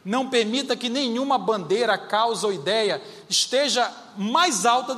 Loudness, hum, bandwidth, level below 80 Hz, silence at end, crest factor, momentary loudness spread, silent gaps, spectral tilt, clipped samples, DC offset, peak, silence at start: -22 LUFS; none; 15.5 kHz; -78 dBFS; 0 s; 16 dB; 5 LU; none; -2.5 dB/octave; under 0.1%; under 0.1%; -6 dBFS; 0.05 s